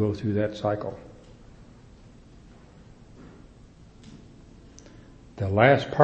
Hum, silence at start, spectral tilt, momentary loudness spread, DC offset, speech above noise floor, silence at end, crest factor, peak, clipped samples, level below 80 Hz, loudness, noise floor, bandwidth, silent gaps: none; 0 s; -7.5 dB/octave; 30 LU; under 0.1%; 28 dB; 0 s; 26 dB; -2 dBFS; under 0.1%; -54 dBFS; -24 LUFS; -50 dBFS; 8.4 kHz; none